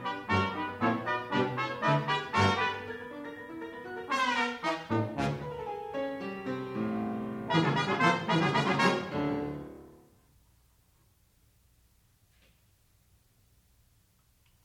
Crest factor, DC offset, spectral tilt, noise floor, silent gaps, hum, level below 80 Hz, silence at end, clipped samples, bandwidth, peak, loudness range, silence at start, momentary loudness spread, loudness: 20 dB; under 0.1%; -5.5 dB/octave; -67 dBFS; none; none; -64 dBFS; 4.7 s; under 0.1%; 16 kHz; -12 dBFS; 5 LU; 0 s; 14 LU; -31 LUFS